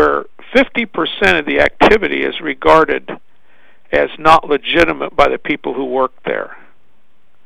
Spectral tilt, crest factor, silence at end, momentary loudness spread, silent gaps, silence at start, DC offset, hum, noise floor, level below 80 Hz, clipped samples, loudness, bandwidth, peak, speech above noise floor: -5 dB/octave; 14 dB; 0.9 s; 11 LU; none; 0 s; 2%; none; -60 dBFS; -36 dBFS; 0.3%; -14 LUFS; 14 kHz; 0 dBFS; 47 dB